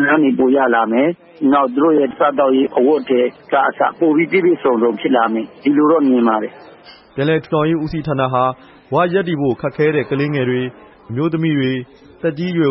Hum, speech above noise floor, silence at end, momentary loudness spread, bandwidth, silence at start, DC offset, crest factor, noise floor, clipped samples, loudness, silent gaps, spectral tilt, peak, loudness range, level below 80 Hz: none; 27 dB; 0 s; 8 LU; 5.8 kHz; 0 s; under 0.1%; 14 dB; -42 dBFS; under 0.1%; -16 LUFS; none; -10.5 dB/octave; -2 dBFS; 4 LU; -52 dBFS